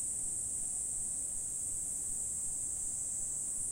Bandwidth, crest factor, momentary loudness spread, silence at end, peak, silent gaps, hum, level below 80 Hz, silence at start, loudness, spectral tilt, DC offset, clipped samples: 16 kHz; 12 dB; 1 LU; 0 s; -26 dBFS; none; none; -58 dBFS; 0 s; -35 LUFS; -1.5 dB/octave; under 0.1%; under 0.1%